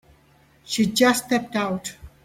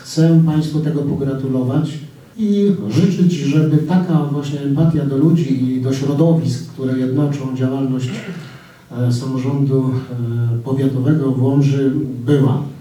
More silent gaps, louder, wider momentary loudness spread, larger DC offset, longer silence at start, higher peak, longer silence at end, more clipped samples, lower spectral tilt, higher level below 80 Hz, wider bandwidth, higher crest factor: neither; second, -22 LUFS vs -17 LUFS; first, 12 LU vs 8 LU; neither; first, 0.7 s vs 0 s; about the same, -4 dBFS vs -2 dBFS; first, 0.15 s vs 0 s; neither; second, -3.5 dB/octave vs -8.5 dB/octave; about the same, -54 dBFS vs -54 dBFS; first, 16.5 kHz vs 12 kHz; first, 20 dB vs 14 dB